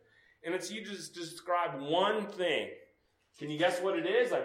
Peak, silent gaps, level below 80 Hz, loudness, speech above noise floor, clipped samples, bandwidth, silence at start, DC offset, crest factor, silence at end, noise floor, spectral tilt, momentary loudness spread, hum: -16 dBFS; none; -82 dBFS; -33 LUFS; 38 dB; under 0.1%; 16 kHz; 0.45 s; under 0.1%; 18 dB; 0 s; -71 dBFS; -4 dB/octave; 13 LU; none